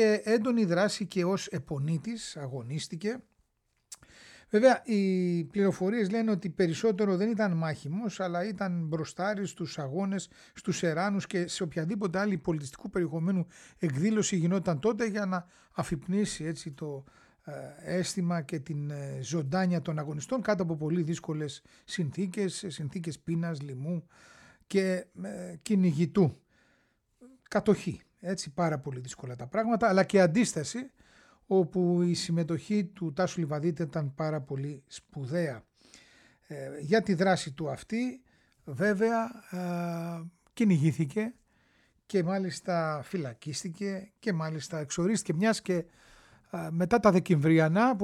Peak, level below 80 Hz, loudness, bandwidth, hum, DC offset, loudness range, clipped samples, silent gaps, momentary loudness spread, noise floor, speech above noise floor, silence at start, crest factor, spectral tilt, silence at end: -10 dBFS; -64 dBFS; -30 LUFS; 12.5 kHz; none; under 0.1%; 6 LU; under 0.1%; none; 14 LU; -76 dBFS; 47 dB; 0 s; 20 dB; -6 dB/octave; 0 s